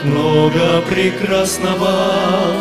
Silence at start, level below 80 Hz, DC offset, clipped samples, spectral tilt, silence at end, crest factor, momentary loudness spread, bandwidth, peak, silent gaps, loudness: 0 s; -46 dBFS; 0.6%; under 0.1%; -5 dB/octave; 0 s; 14 dB; 3 LU; 15.5 kHz; 0 dBFS; none; -14 LUFS